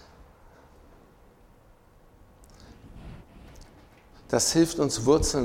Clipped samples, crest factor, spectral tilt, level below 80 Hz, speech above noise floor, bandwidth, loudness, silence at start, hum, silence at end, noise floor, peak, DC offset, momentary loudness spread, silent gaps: under 0.1%; 22 dB; -4 dB/octave; -44 dBFS; 33 dB; 16.5 kHz; -24 LUFS; 2.7 s; none; 0 s; -56 dBFS; -8 dBFS; under 0.1%; 26 LU; none